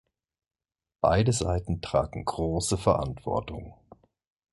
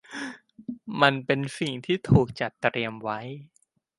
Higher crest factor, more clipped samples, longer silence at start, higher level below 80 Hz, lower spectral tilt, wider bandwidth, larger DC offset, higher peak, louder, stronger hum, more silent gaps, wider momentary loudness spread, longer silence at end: about the same, 22 dB vs 24 dB; neither; first, 1.05 s vs 0.1 s; first, -42 dBFS vs -50 dBFS; about the same, -5.5 dB/octave vs -6.5 dB/octave; about the same, 11.5 kHz vs 11.5 kHz; neither; second, -6 dBFS vs -2 dBFS; about the same, -27 LUFS vs -26 LUFS; neither; neither; second, 9 LU vs 18 LU; first, 0.8 s vs 0.55 s